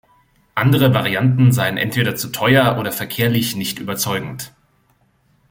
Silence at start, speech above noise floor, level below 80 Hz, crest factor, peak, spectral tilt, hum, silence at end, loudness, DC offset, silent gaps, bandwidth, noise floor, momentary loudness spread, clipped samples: 0.55 s; 43 dB; -52 dBFS; 18 dB; 0 dBFS; -5 dB/octave; none; 1.05 s; -17 LUFS; under 0.1%; none; 17 kHz; -59 dBFS; 10 LU; under 0.1%